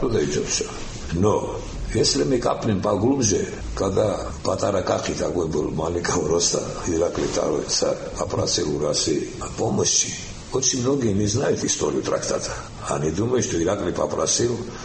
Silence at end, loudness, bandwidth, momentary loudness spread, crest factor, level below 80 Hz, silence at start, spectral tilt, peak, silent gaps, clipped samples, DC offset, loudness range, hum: 0 s; -22 LUFS; 8.8 kHz; 7 LU; 16 dB; -40 dBFS; 0 s; -4 dB/octave; -6 dBFS; none; under 0.1%; under 0.1%; 1 LU; none